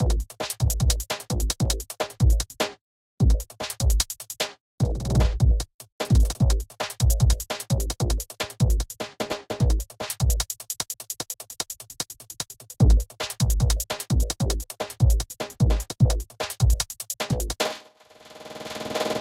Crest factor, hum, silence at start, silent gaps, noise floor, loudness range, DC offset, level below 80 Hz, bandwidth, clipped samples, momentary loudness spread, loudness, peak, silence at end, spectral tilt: 16 dB; none; 0 s; 2.81-3.18 s, 4.60-4.78 s, 5.74-5.79 s, 5.92-5.99 s; -51 dBFS; 3 LU; under 0.1%; -26 dBFS; 16.5 kHz; under 0.1%; 11 LU; -26 LUFS; -8 dBFS; 0 s; -4.5 dB/octave